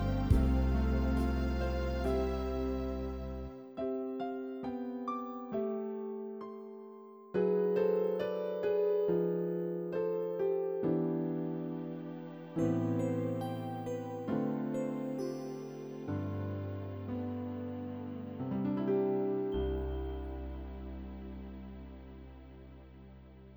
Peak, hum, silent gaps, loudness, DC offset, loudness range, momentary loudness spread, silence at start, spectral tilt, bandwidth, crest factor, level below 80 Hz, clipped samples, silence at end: -14 dBFS; none; none; -36 LUFS; under 0.1%; 7 LU; 16 LU; 0 s; -8.5 dB/octave; over 20 kHz; 20 dB; -42 dBFS; under 0.1%; 0 s